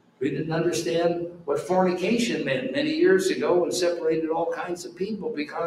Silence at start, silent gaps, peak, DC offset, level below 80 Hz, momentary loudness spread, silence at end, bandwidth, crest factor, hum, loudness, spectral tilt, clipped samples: 0.2 s; none; -8 dBFS; under 0.1%; -64 dBFS; 9 LU; 0 s; 13.5 kHz; 16 dB; none; -25 LUFS; -5 dB/octave; under 0.1%